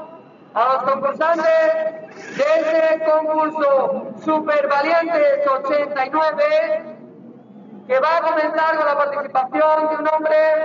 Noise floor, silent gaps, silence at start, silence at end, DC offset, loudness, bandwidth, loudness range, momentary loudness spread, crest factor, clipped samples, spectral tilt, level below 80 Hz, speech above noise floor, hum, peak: -42 dBFS; none; 0 s; 0 s; under 0.1%; -18 LUFS; 7.4 kHz; 2 LU; 7 LU; 12 dB; under 0.1%; -2 dB/octave; -82 dBFS; 24 dB; none; -6 dBFS